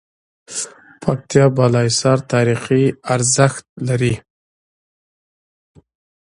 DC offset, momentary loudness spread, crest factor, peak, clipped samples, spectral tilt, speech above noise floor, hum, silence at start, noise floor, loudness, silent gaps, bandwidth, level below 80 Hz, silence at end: under 0.1%; 12 LU; 18 dB; 0 dBFS; under 0.1%; -5 dB/octave; over 75 dB; none; 0.5 s; under -90 dBFS; -17 LUFS; 3.69-3.76 s; 11.5 kHz; -50 dBFS; 2 s